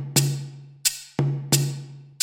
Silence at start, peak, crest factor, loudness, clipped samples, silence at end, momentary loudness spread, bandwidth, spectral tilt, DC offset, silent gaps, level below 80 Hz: 0 s; -2 dBFS; 24 dB; -24 LUFS; under 0.1%; 0.1 s; 16 LU; 17 kHz; -3.5 dB/octave; under 0.1%; none; -60 dBFS